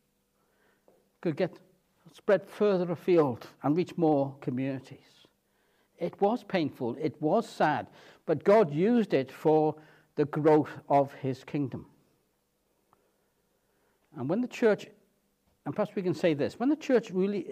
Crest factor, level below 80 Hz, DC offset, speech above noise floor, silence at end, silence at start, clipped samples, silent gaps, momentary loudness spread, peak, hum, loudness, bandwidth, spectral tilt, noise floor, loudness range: 18 dB; -78 dBFS; under 0.1%; 46 dB; 0 s; 1.2 s; under 0.1%; none; 12 LU; -12 dBFS; none; -29 LUFS; 14 kHz; -7.5 dB/octave; -74 dBFS; 8 LU